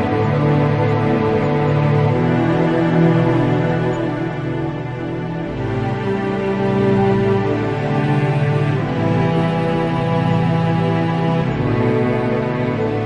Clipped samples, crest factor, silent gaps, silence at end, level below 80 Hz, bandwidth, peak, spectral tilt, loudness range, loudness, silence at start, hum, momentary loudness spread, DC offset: under 0.1%; 14 dB; none; 0 s; -42 dBFS; 8.2 kHz; -2 dBFS; -9 dB/octave; 4 LU; -18 LUFS; 0 s; none; 7 LU; under 0.1%